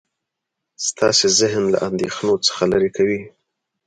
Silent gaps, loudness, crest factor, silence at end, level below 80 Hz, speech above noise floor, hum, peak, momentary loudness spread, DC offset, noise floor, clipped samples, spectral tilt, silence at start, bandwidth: none; -18 LUFS; 16 dB; 0.6 s; -54 dBFS; 63 dB; none; -2 dBFS; 9 LU; under 0.1%; -81 dBFS; under 0.1%; -3 dB/octave; 0.8 s; 9.6 kHz